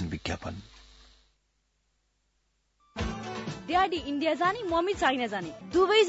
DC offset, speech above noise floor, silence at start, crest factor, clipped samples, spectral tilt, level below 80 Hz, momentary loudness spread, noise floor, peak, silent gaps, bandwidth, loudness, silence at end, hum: under 0.1%; 47 dB; 0 s; 18 dB; under 0.1%; -4.5 dB/octave; -50 dBFS; 11 LU; -74 dBFS; -12 dBFS; none; 8 kHz; -29 LUFS; 0 s; 50 Hz at -65 dBFS